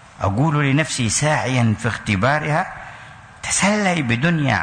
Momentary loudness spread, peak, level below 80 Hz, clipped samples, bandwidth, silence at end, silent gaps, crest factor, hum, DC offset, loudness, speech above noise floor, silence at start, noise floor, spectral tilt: 11 LU; -6 dBFS; -46 dBFS; under 0.1%; 9.6 kHz; 0 s; none; 12 dB; none; under 0.1%; -19 LUFS; 22 dB; 0.2 s; -40 dBFS; -4.5 dB/octave